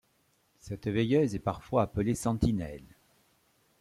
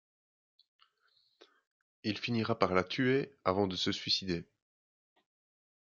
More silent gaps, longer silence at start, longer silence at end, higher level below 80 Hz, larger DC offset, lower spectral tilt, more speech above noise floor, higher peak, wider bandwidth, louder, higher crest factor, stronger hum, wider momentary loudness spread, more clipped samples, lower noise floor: neither; second, 0.65 s vs 2.05 s; second, 0.95 s vs 1.4 s; first, -50 dBFS vs -74 dBFS; neither; first, -7 dB/octave vs -5 dB/octave; about the same, 41 dB vs 41 dB; about the same, -12 dBFS vs -10 dBFS; first, 15 kHz vs 7.6 kHz; first, -30 LUFS vs -33 LUFS; second, 18 dB vs 26 dB; neither; first, 14 LU vs 8 LU; neither; about the same, -71 dBFS vs -74 dBFS